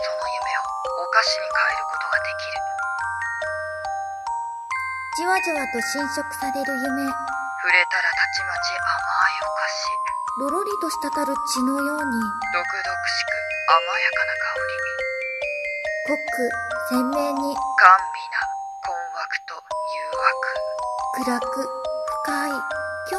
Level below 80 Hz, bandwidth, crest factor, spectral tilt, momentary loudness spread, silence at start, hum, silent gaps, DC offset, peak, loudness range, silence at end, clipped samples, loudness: -58 dBFS; 14 kHz; 24 dB; -2 dB/octave; 9 LU; 0 s; none; none; under 0.1%; 0 dBFS; 5 LU; 0 s; under 0.1%; -23 LUFS